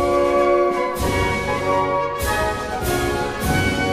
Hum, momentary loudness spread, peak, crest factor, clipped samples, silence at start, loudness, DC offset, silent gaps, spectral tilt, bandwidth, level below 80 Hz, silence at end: none; 5 LU; -6 dBFS; 14 dB; under 0.1%; 0 s; -20 LUFS; under 0.1%; none; -5 dB/octave; 15.5 kHz; -32 dBFS; 0 s